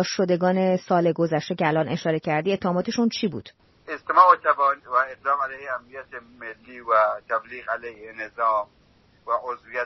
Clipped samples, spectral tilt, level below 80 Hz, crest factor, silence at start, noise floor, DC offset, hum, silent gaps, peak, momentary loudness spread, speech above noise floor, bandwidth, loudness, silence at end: under 0.1%; -4.5 dB/octave; -64 dBFS; 22 dB; 0 s; -58 dBFS; under 0.1%; none; none; -2 dBFS; 18 LU; 34 dB; 6.2 kHz; -23 LUFS; 0 s